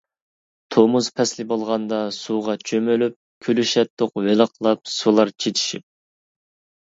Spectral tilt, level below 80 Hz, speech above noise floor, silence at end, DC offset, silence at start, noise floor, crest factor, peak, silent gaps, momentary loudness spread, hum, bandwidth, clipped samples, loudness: -4.5 dB/octave; -68 dBFS; over 70 dB; 1.05 s; under 0.1%; 0.7 s; under -90 dBFS; 20 dB; -2 dBFS; 3.16-3.41 s, 3.90-3.97 s; 7 LU; none; 7.8 kHz; under 0.1%; -20 LUFS